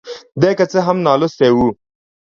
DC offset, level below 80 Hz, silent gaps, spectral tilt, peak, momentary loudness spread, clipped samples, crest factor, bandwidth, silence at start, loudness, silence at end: under 0.1%; -48 dBFS; none; -6.5 dB/octave; 0 dBFS; 5 LU; under 0.1%; 16 dB; 7.2 kHz; 0.05 s; -14 LUFS; 0.6 s